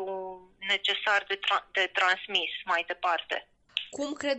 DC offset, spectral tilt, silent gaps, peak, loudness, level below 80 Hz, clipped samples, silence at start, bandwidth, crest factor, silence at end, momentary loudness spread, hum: under 0.1%; -1 dB/octave; none; -10 dBFS; -28 LUFS; -70 dBFS; under 0.1%; 0 s; 8.4 kHz; 20 dB; 0 s; 11 LU; none